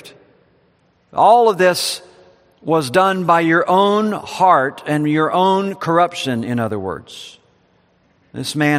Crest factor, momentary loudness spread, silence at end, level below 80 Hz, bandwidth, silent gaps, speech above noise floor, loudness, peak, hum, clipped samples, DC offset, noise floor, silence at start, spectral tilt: 18 dB; 15 LU; 0 s; -62 dBFS; 15.5 kHz; none; 42 dB; -16 LUFS; 0 dBFS; none; under 0.1%; under 0.1%; -58 dBFS; 0.05 s; -5 dB/octave